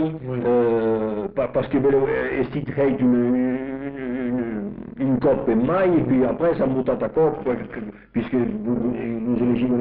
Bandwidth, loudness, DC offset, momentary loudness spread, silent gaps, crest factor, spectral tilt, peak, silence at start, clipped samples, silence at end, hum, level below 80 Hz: 4.4 kHz; -22 LUFS; under 0.1%; 9 LU; none; 10 dB; -7.5 dB/octave; -10 dBFS; 0 s; under 0.1%; 0 s; none; -48 dBFS